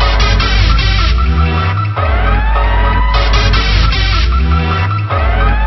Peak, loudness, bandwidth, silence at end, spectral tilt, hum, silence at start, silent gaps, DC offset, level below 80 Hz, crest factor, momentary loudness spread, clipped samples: 0 dBFS; -12 LUFS; 6 kHz; 0 s; -5.5 dB/octave; none; 0 s; none; under 0.1%; -12 dBFS; 10 dB; 3 LU; under 0.1%